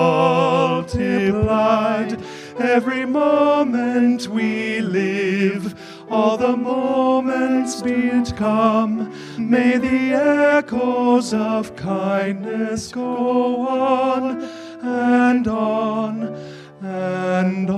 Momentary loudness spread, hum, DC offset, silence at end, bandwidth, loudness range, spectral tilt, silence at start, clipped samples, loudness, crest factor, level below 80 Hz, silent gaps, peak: 10 LU; none; under 0.1%; 0 s; 11.5 kHz; 3 LU; -6 dB/octave; 0 s; under 0.1%; -19 LUFS; 16 dB; -50 dBFS; none; -2 dBFS